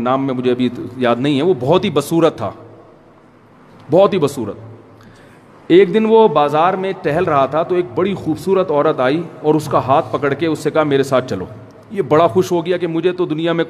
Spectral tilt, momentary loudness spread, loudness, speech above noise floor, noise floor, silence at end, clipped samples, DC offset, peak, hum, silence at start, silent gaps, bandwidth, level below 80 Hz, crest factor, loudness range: -6.5 dB/octave; 9 LU; -15 LUFS; 31 dB; -46 dBFS; 0 s; under 0.1%; under 0.1%; 0 dBFS; none; 0 s; none; 14.5 kHz; -54 dBFS; 16 dB; 4 LU